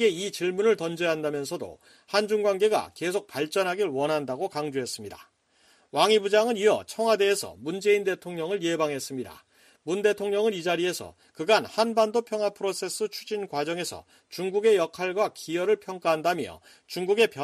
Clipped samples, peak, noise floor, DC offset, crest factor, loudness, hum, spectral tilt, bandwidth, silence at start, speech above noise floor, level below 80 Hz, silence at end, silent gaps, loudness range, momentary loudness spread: under 0.1%; -8 dBFS; -63 dBFS; under 0.1%; 18 dB; -26 LUFS; none; -3.5 dB/octave; 15 kHz; 0 s; 37 dB; -70 dBFS; 0 s; none; 3 LU; 12 LU